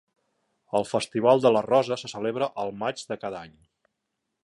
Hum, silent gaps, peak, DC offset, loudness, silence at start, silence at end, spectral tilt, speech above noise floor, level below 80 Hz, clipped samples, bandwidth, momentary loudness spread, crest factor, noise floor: none; none; -6 dBFS; under 0.1%; -25 LUFS; 0.75 s; 0.95 s; -5 dB/octave; 56 dB; -68 dBFS; under 0.1%; 11.5 kHz; 13 LU; 20 dB; -81 dBFS